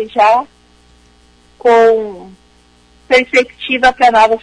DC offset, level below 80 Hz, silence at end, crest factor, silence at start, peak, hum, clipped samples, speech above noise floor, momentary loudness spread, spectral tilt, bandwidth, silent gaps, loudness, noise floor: under 0.1%; -46 dBFS; 0.05 s; 14 dB; 0 s; 0 dBFS; 60 Hz at -50 dBFS; under 0.1%; 38 dB; 8 LU; -3 dB/octave; 10.5 kHz; none; -11 LUFS; -48 dBFS